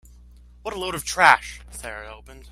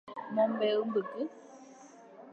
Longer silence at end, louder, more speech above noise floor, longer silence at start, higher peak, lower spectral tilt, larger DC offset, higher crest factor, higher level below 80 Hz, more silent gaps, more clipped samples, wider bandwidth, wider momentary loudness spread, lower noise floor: about the same, 0 s vs 0 s; first, -19 LUFS vs -32 LUFS; about the same, 25 dB vs 23 dB; first, 0.65 s vs 0.05 s; first, 0 dBFS vs -18 dBFS; second, -2 dB/octave vs -6 dB/octave; neither; first, 24 dB vs 16 dB; first, -46 dBFS vs -88 dBFS; neither; neither; first, 16 kHz vs 8 kHz; second, 21 LU vs 24 LU; second, -48 dBFS vs -54 dBFS